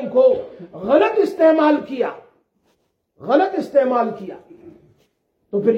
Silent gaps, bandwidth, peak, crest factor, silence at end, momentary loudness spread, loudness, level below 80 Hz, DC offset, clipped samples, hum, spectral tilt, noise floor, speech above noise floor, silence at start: none; 8 kHz; -2 dBFS; 18 dB; 0 s; 19 LU; -18 LUFS; -64 dBFS; under 0.1%; under 0.1%; none; -7 dB/octave; -66 dBFS; 49 dB; 0 s